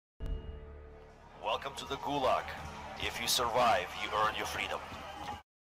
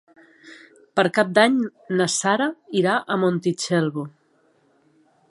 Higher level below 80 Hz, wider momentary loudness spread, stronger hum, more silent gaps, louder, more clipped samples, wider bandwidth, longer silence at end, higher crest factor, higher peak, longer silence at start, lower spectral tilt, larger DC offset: first, -50 dBFS vs -72 dBFS; first, 15 LU vs 9 LU; neither; neither; second, -34 LUFS vs -21 LUFS; neither; first, 16 kHz vs 11.5 kHz; second, 0.2 s vs 1.2 s; second, 16 dB vs 22 dB; second, -20 dBFS vs -2 dBFS; second, 0.2 s vs 0.45 s; second, -2.5 dB/octave vs -4.5 dB/octave; neither